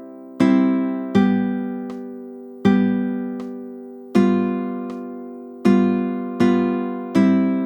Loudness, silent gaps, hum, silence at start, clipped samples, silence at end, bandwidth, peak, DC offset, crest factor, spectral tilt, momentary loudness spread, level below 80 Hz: -20 LUFS; none; none; 0 s; under 0.1%; 0 s; 8.6 kHz; -4 dBFS; under 0.1%; 16 dB; -8 dB/octave; 17 LU; -64 dBFS